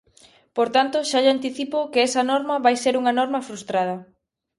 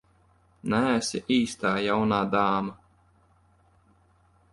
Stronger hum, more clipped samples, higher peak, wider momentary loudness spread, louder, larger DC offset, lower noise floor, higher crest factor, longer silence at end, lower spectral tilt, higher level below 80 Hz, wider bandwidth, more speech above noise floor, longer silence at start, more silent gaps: neither; neither; first, -6 dBFS vs -10 dBFS; first, 8 LU vs 5 LU; first, -21 LUFS vs -26 LUFS; neither; second, -54 dBFS vs -62 dBFS; about the same, 18 dB vs 18 dB; second, 0.55 s vs 1.8 s; second, -3 dB/octave vs -5 dB/octave; second, -70 dBFS vs -60 dBFS; about the same, 11.5 kHz vs 11.5 kHz; about the same, 34 dB vs 37 dB; about the same, 0.55 s vs 0.65 s; neither